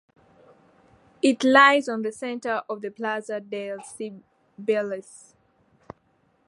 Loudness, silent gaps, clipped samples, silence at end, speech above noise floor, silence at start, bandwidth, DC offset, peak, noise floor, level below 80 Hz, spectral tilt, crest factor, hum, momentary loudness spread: -23 LUFS; none; under 0.1%; 1.3 s; 42 dB; 1.25 s; 11.5 kHz; under 0.1%; -2 dBFS; -66 dBFS; -74 dBFS; -3.5 dB/octave; 24 dB; none; 20 LU